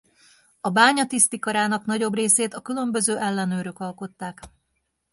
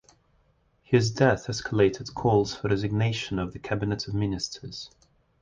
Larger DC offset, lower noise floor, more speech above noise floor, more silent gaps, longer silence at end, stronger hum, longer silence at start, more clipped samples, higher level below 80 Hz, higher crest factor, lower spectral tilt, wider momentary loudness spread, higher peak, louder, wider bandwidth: neither; first, -75 dBFS vs -66 dBFS; first, 52 dB vs 40 dB; neither; about the same, 0.65 s vs 0.55 s; neither; second, 0.65 s vs 0.9 s; neither; second, -64 dBFS vs -50 dBFS; about the same, 22 dB vs 20 dB; second, -3 dB/octave vs -6 dB/octave; first, 16 LU vs 10 LU; first, -2 dBFS vs -8 dBFS; first, -21 LUFS vs -26 LUFS; first, 12 kHz vs 9.4 kHz